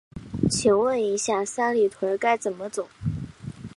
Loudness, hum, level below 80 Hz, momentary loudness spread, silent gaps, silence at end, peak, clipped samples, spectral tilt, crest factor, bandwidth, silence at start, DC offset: -24 LUFS; none; -50 dBFS; 14 LU; none; 0.1 s; -8 dBFS; under 0.1%; -4.5 dB/octave; 18 dB; 11.5 kHz; 0.15 s; under 0.1%